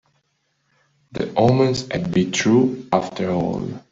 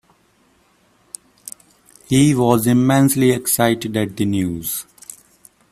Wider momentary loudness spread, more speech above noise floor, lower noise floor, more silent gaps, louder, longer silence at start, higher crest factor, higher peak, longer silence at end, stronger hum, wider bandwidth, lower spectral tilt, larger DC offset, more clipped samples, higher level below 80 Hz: second, 10 LU vs 23 LU; first, 50 dB vs 42 dB; first, -69 dBFS vs -58 dBFS; neither; second, -20 LUFS vs -17 LUFS; second, 1.15 s vs 1.45 s; about the same, 18 dB vs 18 dB; about the same, -2 dBFS vs 0 dBFS; second, 0.1 s vs 0.9 s; neither; second, 7.8 kHz vs 16 kHz; about the same, -6 dB/octave vs -5.5 dB/octave; neither; neither; about the same, -52 dBFS vs -52 dBFS